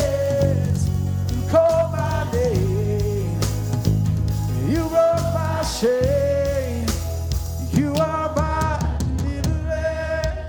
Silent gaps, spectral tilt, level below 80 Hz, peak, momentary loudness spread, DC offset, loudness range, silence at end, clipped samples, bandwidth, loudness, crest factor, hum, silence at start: none; -6.5 dB/octave; -30 dBFS; -4 dBFS; 6 LU; under 0.1%; 2 LU; 0 s; under 0.1%; over 20 kHz; -21 LUFS; 16 dB; none; 0 s